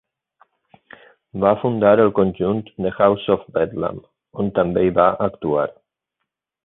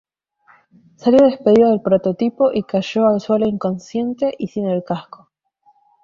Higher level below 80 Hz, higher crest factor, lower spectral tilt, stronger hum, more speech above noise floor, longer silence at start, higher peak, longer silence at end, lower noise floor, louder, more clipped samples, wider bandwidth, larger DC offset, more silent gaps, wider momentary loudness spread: first, -50 dBFS vs -56 dBFS; about the same, 18 dB vs 16 dB; first, -12 dB/octave vs -7.5 dB/octave; neither; first, 61 dB vs 42 dB; first, 1.35 s vs 1.05 s; about the same, -2 dBFS vs -2 dBFS; about the same, 0.95 s vs 1 s; first, -79 dBFS vs -58 dBFS; about the same, -19 LUFS vs -17 LUFS; neither; second, 4 kHz vs 7.4 kHz; neither; neither; about the same, 12 LU vs 10 LU